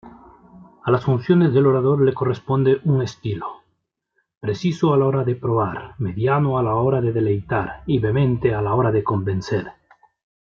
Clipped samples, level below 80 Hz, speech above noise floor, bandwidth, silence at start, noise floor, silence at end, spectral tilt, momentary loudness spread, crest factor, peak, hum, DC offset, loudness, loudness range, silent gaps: under 0.1%; -50 dBFS; 53 dB; 7 kHz; 0.05 s; -72 dBFS; 0.8 s; -8.5 dB/octave; 11 LU; 16 dB; -4 dBFS; none; under 0.1%; -20 LUFS; 3 LU; 4.37-4.41 s